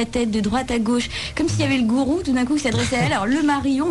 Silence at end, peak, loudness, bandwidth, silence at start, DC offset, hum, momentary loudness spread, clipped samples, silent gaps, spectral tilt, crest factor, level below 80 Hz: 0 s; -8 dBFS; -20 LUFS; 12 kHz; 0 s; under 0.1%; none; 3 LU; under 0.1%; none; -5 dB/octave; 12 dB; -40 dBFS